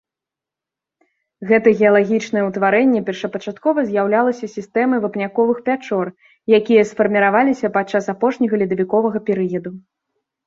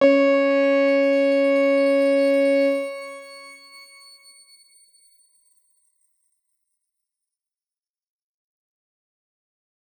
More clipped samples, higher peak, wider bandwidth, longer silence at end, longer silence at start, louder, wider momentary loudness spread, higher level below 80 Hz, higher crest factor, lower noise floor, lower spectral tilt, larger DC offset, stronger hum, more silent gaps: neither; first, -2 dBFS vs -6 dBFS; second, 7.6 kHz vs 19 kHz; second, 0.65 s vs 6.45 s; first, 1.4 s vs 0 s; about the same, -17 LUFS vs -19 LUFS; second, 10 LU vs 20 LU; first, -62 dBFS vs -88 dBFS; about the same, 16 dB vs 18 dB; about the same, -87 dBFS vs under -90 dBFS; first, -6.5 dB/octave vs -4 dB/octave; neither; neither; neither